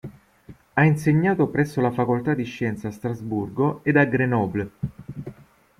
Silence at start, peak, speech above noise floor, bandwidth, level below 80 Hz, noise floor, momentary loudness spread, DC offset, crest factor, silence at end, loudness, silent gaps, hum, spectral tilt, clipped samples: 0.05 s; -6 dBFS; 27 dB; 13.5 kHz; -54 dBFS; -49 dBFS; 15 LU; under 0.1%; 18 dB; 0.45 s; -23 LUFS; none; none; -8.5 dB/octave; under 0.1%